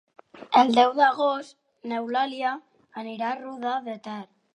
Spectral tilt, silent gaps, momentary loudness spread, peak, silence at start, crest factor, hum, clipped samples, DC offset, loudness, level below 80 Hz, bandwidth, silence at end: -4 dB/octave; none; 19 LU; -4 dBFS; 0.35 s; 22 dB; none; under 0.1%; under 0.1%; -24 LUFS; -78 dBFS; 10.5 kHz; 0.3 s